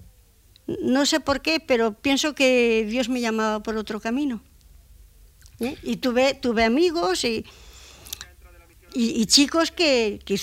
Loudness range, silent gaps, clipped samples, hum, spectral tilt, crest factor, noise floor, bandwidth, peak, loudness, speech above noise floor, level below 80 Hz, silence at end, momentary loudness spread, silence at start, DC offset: 5 LU; none; under 0.1%; none; -3 dB/octave; 18 dB; -55 dBFS; 16 kHz; -6 dBFS; -22 LUFS; 33 dB; -50 dBFS; 0 s; 16 LU; 0 s; under 0.1%